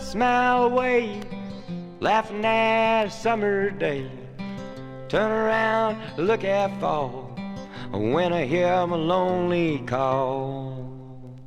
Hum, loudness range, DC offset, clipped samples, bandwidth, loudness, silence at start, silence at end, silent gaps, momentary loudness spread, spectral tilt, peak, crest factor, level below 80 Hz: none; 2 LU; under 0.1%; under 0.1%; 12.5 kHz; -23 LUFS; 0 s; 0 s; none; 16 LU; -6 dB/octave; -8 dBFS; 18 dB; -50 dBFS